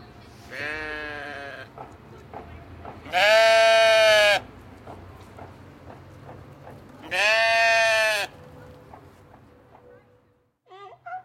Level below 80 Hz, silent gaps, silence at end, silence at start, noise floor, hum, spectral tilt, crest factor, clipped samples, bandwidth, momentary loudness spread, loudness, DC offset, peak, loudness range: -58 dBFS; none; 0.05 s; 0.5 s; -64 dBFS; none; -1.5 dB/octave; 20 dB; under 0.1%; 16 kHz; 26 LU; -19 LUFS; under 0.1%; -6 dBFS; 9 LU